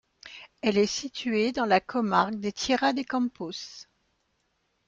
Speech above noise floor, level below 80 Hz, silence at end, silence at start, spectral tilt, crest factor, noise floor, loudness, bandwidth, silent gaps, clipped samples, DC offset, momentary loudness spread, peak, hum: 47 dB; -64 dBFS; 1.05 s; 0.25 s; -4 dB/octave; 22 dB; -74 dBFS; -27 LUFS; 8.6 kHz; none; under 0.1%; under 0.1%; 18 LU; -6 dBFS; none